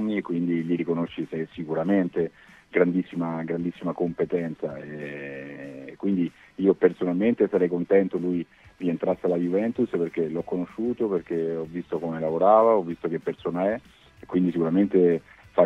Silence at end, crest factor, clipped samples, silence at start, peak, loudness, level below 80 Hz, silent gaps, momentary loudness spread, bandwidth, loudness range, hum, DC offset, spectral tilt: 0 s; 20 dB; under 0.1%; 0 s; -6 dBFS; -25 LUFS; -62 dBFS; none; 11 LU; 6.4 kHz; 4 LU; none; under 0.1%; -9.5 dB/octave